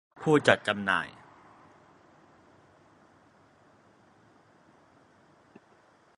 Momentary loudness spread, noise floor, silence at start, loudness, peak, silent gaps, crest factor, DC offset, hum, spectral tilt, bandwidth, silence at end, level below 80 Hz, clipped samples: 7 LU; -62 dBFS; 0.2 s; -26 LUFS; -4 dBFS; none; 30 dB; under 0.1%; none; -5 dB/octave; 11 kHz; 5.05 s; -70 dBFS; under 0.1%